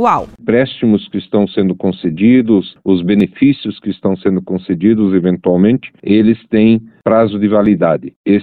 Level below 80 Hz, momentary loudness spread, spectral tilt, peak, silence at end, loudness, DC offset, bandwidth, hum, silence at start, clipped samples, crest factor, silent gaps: -46 dBFS; 6 LU; -9.5 dB/octave; 0 dBFS; 0 s; -13 LUFS; under 0.1%; 4.5 kHz; none; 0 s; under 0.1%; 12 dB; 8.16-8.24 s